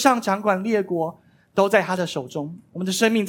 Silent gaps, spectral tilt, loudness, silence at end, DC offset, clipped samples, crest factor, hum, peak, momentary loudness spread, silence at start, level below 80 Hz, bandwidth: none; -4.5 dB/octave; -23 LUFS; 0 s; under 0.1%; under 0.1%; 20 dB; none; -2 dBFS; 12 LU; 0 s; -70 dBFS; 17.5 kHz